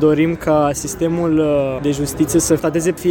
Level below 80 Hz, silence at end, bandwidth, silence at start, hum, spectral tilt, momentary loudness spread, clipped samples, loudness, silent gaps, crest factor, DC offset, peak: -40 dBFS; 0 s; 17 kHz; 0 s; none; -5.5 dB/octave; 5 LU; under 0.1%; -17 LUFS; none; 14 dB; under 0.1%; -2 dBFS